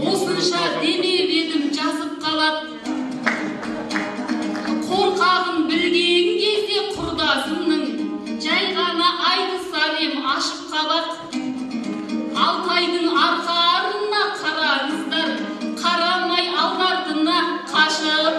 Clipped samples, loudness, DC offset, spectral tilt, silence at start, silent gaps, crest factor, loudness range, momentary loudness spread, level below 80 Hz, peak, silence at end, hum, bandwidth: under 0.1%; -20 LUFS; under 0.1%; -3 dB/octave; 0 s; none; 18 dB; 3 LU; 9 LU; -58 dBFS; -2 dBFS; 0 s; none; 13 kHz